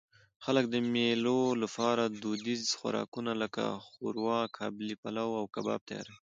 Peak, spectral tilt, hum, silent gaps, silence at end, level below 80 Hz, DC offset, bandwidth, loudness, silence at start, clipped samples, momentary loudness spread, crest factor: -14 dBFS; -4.5 dB/octave; none; 3.08-3.12 s, 4.98-5.03 s, 5.81-5.86 s; 0.15 s; -76 dBFS; under 0.1%; 9 kHz; -33 LUFS; 0.4 s; under 0.1%; 9 LU; 20 dB